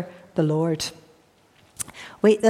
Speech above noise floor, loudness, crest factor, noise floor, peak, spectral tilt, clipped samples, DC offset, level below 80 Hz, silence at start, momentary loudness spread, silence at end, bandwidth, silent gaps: 37 dB; -25 LUFS; 18 dB; -58 dBFS; -6 dBFS; -5.5 dB/octave; under 0.1%; under 0.1%; -62 dBFS; 0 s; 12 LU; 0 s; 15.5 kHz; none